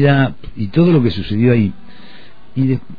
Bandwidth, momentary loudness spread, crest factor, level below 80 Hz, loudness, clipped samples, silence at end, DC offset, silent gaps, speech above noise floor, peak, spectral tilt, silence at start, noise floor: 5 kHz; 8 LU; 14 dB; -40 dBFS; -15 LUFS; under 0.1%; 0.05 s; 4%; none; 29 dB; -2 dBFS; -10.5 dB/octave; 0 s; -43 dBFS